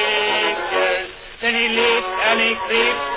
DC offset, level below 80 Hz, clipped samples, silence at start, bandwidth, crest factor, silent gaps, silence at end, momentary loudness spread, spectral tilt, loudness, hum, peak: under 0.1%; -50 dBFS; under 0.1%; 0 s; 4 kHz; 16 dB; none; 0 s; 5 LU; -6 dB/octave; -17 LUFS; none; -4 dBFS